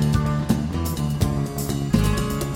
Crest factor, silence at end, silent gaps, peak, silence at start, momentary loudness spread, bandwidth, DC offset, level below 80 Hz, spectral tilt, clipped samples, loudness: 16 dB; 0 s; none; -6 dBFS; 0 s; 5 LU; 17 kHz; under 0.1%; -30 dBFS; -6 dB/octave; under 0.1%; -23 LUFS